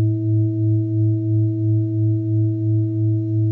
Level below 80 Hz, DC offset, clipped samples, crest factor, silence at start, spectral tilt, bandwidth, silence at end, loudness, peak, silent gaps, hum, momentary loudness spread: -60 dBFS; under 0.1%; under 0.1%; 8 dB; 0 s; -14.5 dB/octave; 0.7 kHz; 0 s; -20 LUFS; -10 dBFS; none; none; 1 LU